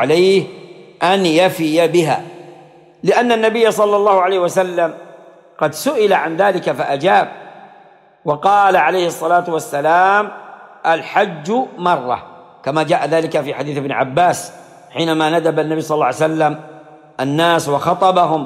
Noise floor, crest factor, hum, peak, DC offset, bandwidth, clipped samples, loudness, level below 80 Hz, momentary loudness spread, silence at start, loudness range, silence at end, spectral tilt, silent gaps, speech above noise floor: -46 dBFS; 14 dB; none; -2 dBFS; under 0.1%; 16 kHz; under 0.1%; -15 LUFS; -62 dBFS; 10 LU; 0 s; 3 LU; 0 s; -5 dB/octave; none; 32 dB